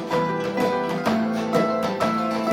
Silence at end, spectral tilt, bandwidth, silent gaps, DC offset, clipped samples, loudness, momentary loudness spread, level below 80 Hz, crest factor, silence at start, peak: 0 s; -6 dB/octave; 16.5 kHz; none; under 0.1%; under 0.1%; -23 LUFS; 2 LU; -62 dBFS; 14 dB; 0 s; -8 dBFS